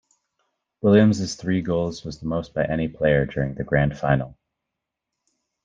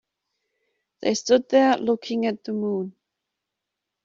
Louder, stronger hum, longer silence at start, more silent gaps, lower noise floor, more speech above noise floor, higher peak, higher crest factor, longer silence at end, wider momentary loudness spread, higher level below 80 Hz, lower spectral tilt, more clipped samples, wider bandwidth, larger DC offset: about the same, -22 LUFS vs -23 LUFS; neither; second, 0.85 s vs 1 s; neither; about the same, -83 dBFS vs -84 dBFS; about the same, 62 dB vs 62 dB; about the same, -4 dBFS vs -6 dBFS; about the same, 20 dB vs 20 dB; first, 1.3 s vs 1.15 s; about the same, 11 LU vs 10 LU; first, -46 dBFS vs -70 dBFS; first, -7 dB/octave vs -4.5 dB/octave; neither; about the same, 7.8 kHz vs 7.6 kHz; neither